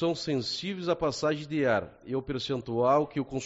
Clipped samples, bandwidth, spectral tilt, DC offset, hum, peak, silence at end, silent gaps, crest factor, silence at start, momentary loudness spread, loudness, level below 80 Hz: under 0.1%; 8 kHz; -4.5 dB/octave; under 0.1%; none; -12 dBFS; 0 s; none; 16 dB; 0 s; 7 LU; -29 LUFS; -58 dBFS